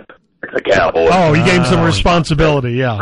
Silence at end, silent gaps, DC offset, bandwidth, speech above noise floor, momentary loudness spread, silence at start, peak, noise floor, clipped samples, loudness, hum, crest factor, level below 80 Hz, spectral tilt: 0 s; none; under 0.1%; 11 kHz; 21 dB; 8 LU; 0.45 s; -2 dBFS; -33 dBFS; under 0.1%; -12 LUFS; none; 10 dB; -28 dBFS; -6 dB/octave